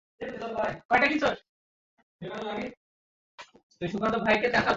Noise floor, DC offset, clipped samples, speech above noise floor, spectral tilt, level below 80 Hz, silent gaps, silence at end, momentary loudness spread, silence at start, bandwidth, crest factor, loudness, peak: under -90 dBFS; under 0.1%; under 0.1%; over 63 dB; -5 dB/octave; -58 dBFS; 0.85-0.89 s, 1.49-1.97 s, 2.03-2.19 s, 2.77-3.38 s, 3.63-3.70 s; 0 s; 16 LU; 0.2 s; 8 kHz; 20 dB; -27 LUFS; -10 dBFS